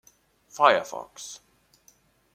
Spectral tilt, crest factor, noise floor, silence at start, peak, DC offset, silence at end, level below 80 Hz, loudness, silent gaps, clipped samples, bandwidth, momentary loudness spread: -2 dB/octave; 24 dB; -62 dBFS; 0.55 s; -4 dBFS; under 0.1%; 1 s; -74 dBFS; -22 LUFS; none; under 0.1%; 16 kHz; 24 LU